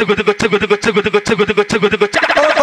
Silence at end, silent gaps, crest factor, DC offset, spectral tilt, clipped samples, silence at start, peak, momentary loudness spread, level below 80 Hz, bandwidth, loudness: 0 s; none; 12 dB; under 0.1%; -4 dB/octave; under 0.1%; 0 s; 0 dBFS; 3 LU; -44 dBFS; 11 kHz; -13 LUFS